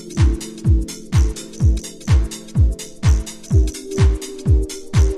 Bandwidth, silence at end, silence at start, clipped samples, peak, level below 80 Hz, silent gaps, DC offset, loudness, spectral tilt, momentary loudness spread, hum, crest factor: 13.5 kHz; 0 s; 0 s; under 0.1%; -4 dBFS; -20 dBFS; none; under 0.1%; -19 LUFS; -6 dB/octave; 4 LU; none; 14 dB